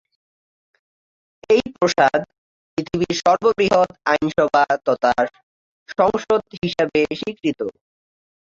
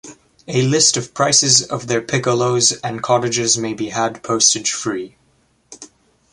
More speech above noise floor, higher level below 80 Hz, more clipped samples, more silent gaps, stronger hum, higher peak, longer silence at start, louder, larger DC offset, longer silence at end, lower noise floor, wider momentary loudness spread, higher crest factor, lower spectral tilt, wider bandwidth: first, over 72 dB vs 42 dB; about the same, -54 dBFS vs -58 dBFS; neither; first, 2.38-2.77 s, 5.43-5.86 s, 6.58-6.62 s vs none; neither; second, -4 dBFS vs 0 dBFS; first, 1.5 s vs 0.05 s; second, -19 LUFS vs -16 LUFS; neither; first, 0.8 s vs 0.45 s; first, under -90 dBFS vs -59 dBFS; about the same, 9 LU vs 10 LU; about the same, 18 dB vs 18 dB; first, -5 dB/octave vs -2.5 dB/octave; second, 7.8 kHz vs 11.5 kHz